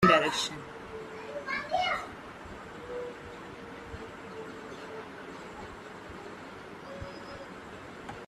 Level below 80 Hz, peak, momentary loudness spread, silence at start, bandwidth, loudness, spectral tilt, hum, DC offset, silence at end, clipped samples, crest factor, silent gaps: -60 dBFS; -8 dBFS; 15 LU; 0 s; 14 kHz; -36 LUFS; -4 dB/octave; none; under 0.1%; 0 s; under 0.1%; 26 dB; none